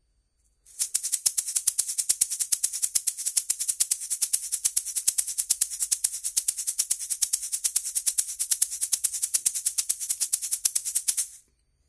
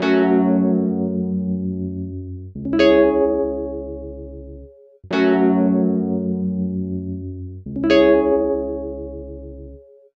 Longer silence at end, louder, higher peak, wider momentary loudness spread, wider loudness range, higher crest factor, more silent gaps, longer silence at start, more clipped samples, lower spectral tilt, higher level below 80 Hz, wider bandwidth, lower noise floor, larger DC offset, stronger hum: about the same, 0.5 s vs 0.4 s; second, -24 LUFS vs -19 LUFS; about the same, -2 dBFS vs -2 dBFS; second, 3 LU vs 19 LU; about the same, 1 LU vs 2 LU; first, 26 dB vs 18 dB; neither; first, 0.7 s vs 0 s; neither; second, 4 dB/octave vs -8 dB/octave; second, -68 dBFS vs -42 dBFS; first, 11 kHz vs 7 kHz; first, -69 dBFS vs -43 dBFS; neither; neither